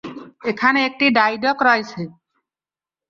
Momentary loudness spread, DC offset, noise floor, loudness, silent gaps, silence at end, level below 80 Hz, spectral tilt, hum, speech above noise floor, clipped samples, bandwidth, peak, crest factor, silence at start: 17 LU; under 0.1%; under -90 dBFS; -17 LUFS; none; 1 s; -64 dBFS; -5 dB/octave; none; over 72 dB; under 0.1%; 7.2 kHz; -2 dBFS; 18 dB; 0.05 s